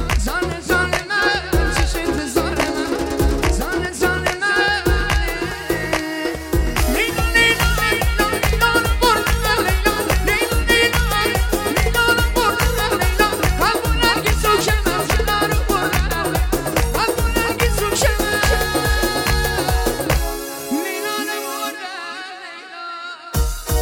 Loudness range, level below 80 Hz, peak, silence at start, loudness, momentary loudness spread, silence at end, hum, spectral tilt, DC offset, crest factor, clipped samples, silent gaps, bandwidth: 4 LU; -24 dBFS; 0 dBFS; 0 s; -18 LUFS; 8 LU; 0 s; none; -4 dB/octave; under 0.1%; 18 dB; under 0.1%; none; 17 kHz